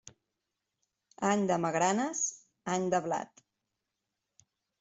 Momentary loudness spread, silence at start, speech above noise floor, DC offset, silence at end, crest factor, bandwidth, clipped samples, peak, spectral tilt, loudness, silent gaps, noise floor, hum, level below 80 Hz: 8 LU; 0.05 s; 56 dB; under 0.1%; 1.55 s; 20 dB; 8.2 kHz; under 0.1%; -14 dBFS; -4 dB/octave; -31 LUFS; none; -86 dBFS; none; -74 dBFS